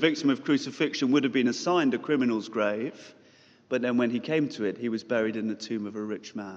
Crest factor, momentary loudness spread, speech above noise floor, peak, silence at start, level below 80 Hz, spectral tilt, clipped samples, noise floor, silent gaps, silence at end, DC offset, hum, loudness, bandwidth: 20 dB; 9 LU; 31 dB; -8 dBFS; 0 s; -80 dBFS; -5 dB/octave; under 0.1%; -58 dBFS; none; 0 s; under 0.1%; none; -28 LUFS; 7.8 kHz